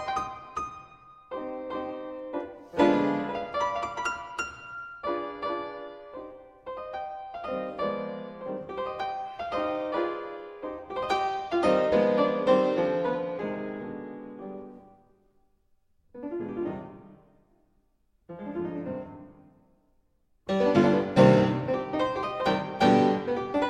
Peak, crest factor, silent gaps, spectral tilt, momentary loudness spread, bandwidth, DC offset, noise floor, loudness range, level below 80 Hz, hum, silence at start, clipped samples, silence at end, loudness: -6 dBFS; 22 dB; none; -7 dB/octave; 18 LU; 10.5 kHz; under 0.1%; -68 dBFS; 15 LU; -60 dBFS; none; 0 s; under 0.1%; 0 s; -28 LUFS